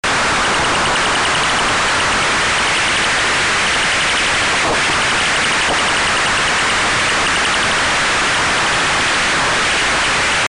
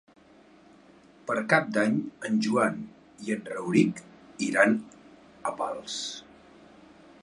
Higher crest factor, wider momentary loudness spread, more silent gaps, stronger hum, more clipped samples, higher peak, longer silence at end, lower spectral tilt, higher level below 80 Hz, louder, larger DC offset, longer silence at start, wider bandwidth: second, 4 dB vs 22 dB; second, 0 LU vs 19 LU; neither; neither; neither; second, -12 dBFS vs -6 dBFS; second, 0.05 s vs 1 s; second, -1.5 dB/octave vs -5 dB/octave; first, -36 dBFS vs -70 dBFS; first, -13 LUFS vs -27 LUFS; neither; second, 0.05 s vs 1.25 s; about the same, 11.5 kHz vs 11.5 kHz